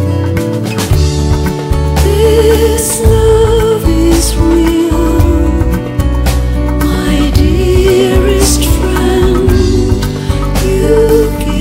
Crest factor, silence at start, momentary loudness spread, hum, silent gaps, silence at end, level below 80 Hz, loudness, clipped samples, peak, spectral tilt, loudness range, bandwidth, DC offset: 8 dB; 0 s; 6 LU; none; none; 0 s; -14 dBFS; -10 LUFS; under 0.1%; 0 dBFS; -6 dB/octave; 2 LU; 16.5 kHz; under 0.1%